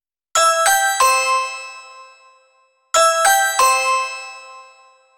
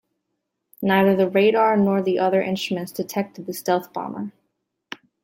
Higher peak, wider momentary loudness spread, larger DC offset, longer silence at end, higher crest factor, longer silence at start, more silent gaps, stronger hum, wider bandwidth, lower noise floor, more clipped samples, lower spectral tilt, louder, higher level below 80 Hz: first, -2 dBFS vs -6 dBFS; first, 19 LU vs 16 LU; neither; second, 0.55 s vs 0.95 s; about the same, 16 dB vs 16 dB; second, 0.35 s vs 0.8 s; neither; neither; first, 20 kHz vs 16.5 kHz; second, -59 dBFS vs -78 dBFS; neither; second, 3 dB/octave vs -6 dB/octave; first, -15 LUFS vs -21 LUFS; about the same, -62 dBFS vs -66 dBFS